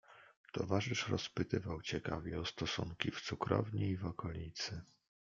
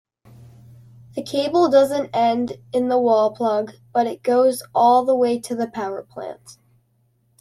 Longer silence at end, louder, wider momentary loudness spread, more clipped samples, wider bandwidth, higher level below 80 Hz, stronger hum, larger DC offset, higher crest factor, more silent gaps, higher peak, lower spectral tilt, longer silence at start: second, 0.45 s vs 0.9 s; second, -40 LUFS vs -19 LUFS; second, 7 LU vs 15 LU; neither; second, 7.6 kHz vs 14 kHz; about the same, -62 dBFS vs -64 dBFS; neither; neither; first, 24 dB vs 16 dB; first, 0.37-0.44 s vs none; second, -16 dBFS vs -4 dBFS; about the same, -5 dB/octave vs -5 dB/octave; second, 0.1 s vs 1.15 s